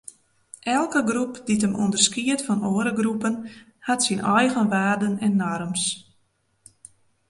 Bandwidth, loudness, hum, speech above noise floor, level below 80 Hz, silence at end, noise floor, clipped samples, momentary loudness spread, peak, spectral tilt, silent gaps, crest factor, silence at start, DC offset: 11.5 kHz; -23 LUFS; none; 45 dB; -62 dBFS; 1.3 s; -67 dBFS; under 0.1%; 8 LU; -4 dBFS; -3.5 dB/octave; none; 20 dB; 0.65 s; under 0.1%